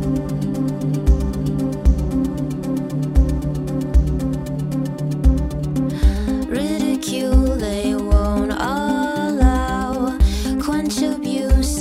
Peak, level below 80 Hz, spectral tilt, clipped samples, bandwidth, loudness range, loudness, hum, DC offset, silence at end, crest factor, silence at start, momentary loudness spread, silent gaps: -2 dBFS; -22 dBFS; -6.5 dB/octave; under 0.1%; 15 kHz; 2 LU; -20 LUFS; none; under 0.1%; 0 s; 16 dB; 0 s; 6 LU; none